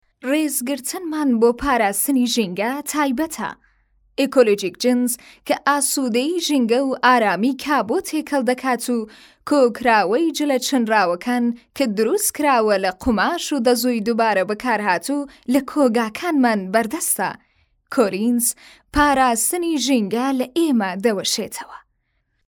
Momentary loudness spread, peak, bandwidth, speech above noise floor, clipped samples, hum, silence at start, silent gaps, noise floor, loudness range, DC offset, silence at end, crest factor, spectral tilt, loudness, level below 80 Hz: 8 LU; -2 dBFS; over 20 kHz; 50 dB; under 0.1%; none; 0.25 s; none; -69 dBFS; 2 LU; under 0.1%; 0.7 s; 18 dB; -3 dB/octave; -19 LUFS; -48 dBFS